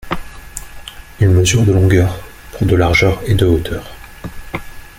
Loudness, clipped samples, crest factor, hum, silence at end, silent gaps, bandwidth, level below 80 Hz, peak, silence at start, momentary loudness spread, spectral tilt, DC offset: -14 LUFS; under 0.1%; 14 dB; none; 0.1 s; none; 16 kHz; -30 dBFS; -2 dBFS; 0.05 s; 21 LU; -5.5 dB/octave; under 0.1%